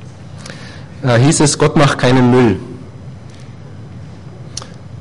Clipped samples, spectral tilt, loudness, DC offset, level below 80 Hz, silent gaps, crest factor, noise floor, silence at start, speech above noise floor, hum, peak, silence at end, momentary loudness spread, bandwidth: under 0.1%; -5.5 dB/octave; -12 LUFS; under 0.1%; -40 dBFS; none; 12 dB; -33 dBFS; 0 s; 23 dB; none; -2 dBFS; 0 s; 23 LU; 11.5 kHz